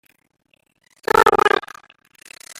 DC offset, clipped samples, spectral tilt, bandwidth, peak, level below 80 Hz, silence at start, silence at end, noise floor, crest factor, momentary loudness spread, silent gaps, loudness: under 0.1%; under 0.1%; -3 dB/octave; 16.5 kHz; -2 dBFS; -50 dBFS; 1.15 s; 1 s; -44 dBFS; 20 dB; 18 LU; none; -16 LUFS